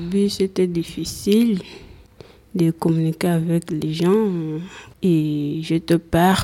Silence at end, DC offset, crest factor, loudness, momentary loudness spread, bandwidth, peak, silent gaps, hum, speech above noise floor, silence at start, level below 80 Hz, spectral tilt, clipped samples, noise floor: 0 s; under 0.1%; 16 dB; -20 LUFS; 10 LU; 16.5 kHz; -4 dBFS; none; none; 27 dB; 0 s; -48 dBFS; -6.5 dB/octave; under 0.1%; -46 dBFS